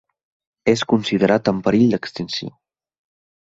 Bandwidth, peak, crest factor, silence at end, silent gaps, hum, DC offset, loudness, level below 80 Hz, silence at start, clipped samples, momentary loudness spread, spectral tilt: 7.8 kHz; -2 dBFS; 18 dB; 0.9 s; none; none; under 0.1%; -19 LUFS; -54 dBFS; 0.65 s; under 0.1%; 10 LU; -6 dB/octave